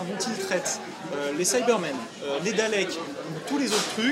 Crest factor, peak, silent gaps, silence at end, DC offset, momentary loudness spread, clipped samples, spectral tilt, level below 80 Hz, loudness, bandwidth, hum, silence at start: 20 dB; -8 dBFS; none; 0 s; under 0.1%; 10 LU; under 0.1%; -3 dB/octave; -74 dBFS; -27 LUFS; 16 kHz; none; 0 s